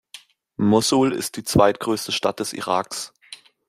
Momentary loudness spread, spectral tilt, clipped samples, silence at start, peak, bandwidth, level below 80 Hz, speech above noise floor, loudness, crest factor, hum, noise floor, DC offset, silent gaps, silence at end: 17 LU; -4.5 dB/octave; under 0.1%; 0.15 s; -2 dBFS; 16 kHz; -50 dBFS; 27 dB; -21 LUFS; 20 dB; none; -47 dBFS; under 0.1%; none; 0.35 s